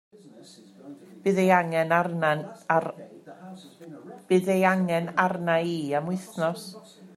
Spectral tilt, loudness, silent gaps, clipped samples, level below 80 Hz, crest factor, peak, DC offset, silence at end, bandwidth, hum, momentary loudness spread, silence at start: -6.5 dB/octave; -25 LUFS; none; under 0.1%; -74 dBFS; 20 dB; -6 dBFS; under 0.1%; 0.1 s; 13.5 kHz; none; 24 LU; 0.25 s